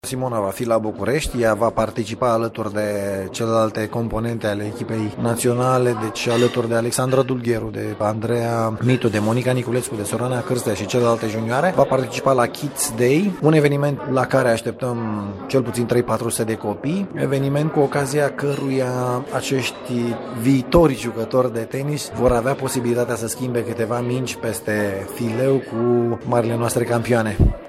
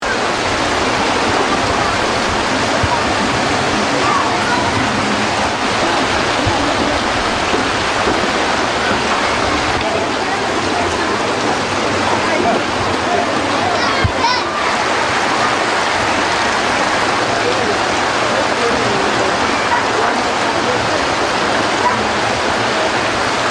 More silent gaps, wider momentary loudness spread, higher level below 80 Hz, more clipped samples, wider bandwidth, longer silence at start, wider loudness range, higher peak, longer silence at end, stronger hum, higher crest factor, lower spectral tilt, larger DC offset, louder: neither; first, 6 LU vs 2 LU; about the same, -38 dBFS vs -38 dBFS; neither; first, 16 kHz vs 13.5 kHz; about the same, 0.05 s vs 0 s; about the same, 3 LU vs 1 LU; about the same, -2 dBFS vs 0 dBFS; about the same, 0 s vs 0 s; neither; about the same, 18 dB vs 14 dB; first, -6 dB/octave vs -3.5 dB/octave; neither; second, -20 LUFS vs -15 LUFS